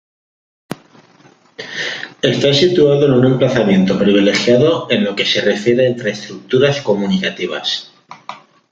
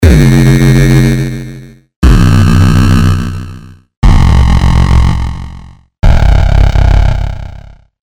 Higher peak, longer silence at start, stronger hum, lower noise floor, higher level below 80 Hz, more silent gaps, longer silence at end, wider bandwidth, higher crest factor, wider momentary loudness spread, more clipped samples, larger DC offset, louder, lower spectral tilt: about the same, 0 dBFS vs 0 dBFS; first, 0.7 s vs 0 s; neither; first, -48 dBFS vs -31 dBFS; second, -54 dBFS vs -10 dBFS; second, none vs 1.96-2.02 s, 3.97-4.02 s; about the same, 0.35 s vs 0.45 s; second, 7.8 kHz vs 16.5 kHz; first, 14 dB vs 8 dB; first, 20 LU vs 16 LU; second, under 0.1% vs 3%; neither; second, -14 LUFS vs -9 LUFS; second, -5.5 dB/octave vs -7 dB/octave